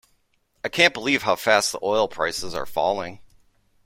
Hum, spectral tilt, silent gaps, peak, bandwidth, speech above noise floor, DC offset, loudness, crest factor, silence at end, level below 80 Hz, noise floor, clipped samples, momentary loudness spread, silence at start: none; -2.5 dB/octave; none; -2 dBFS; 16.5 kHz; 44 dB; under 0.1%; -22 LUFS; 22 dB; 0.65 s; -54 dBFS; -67 dBFS; under 0.1%; 11 LU; 0.65 s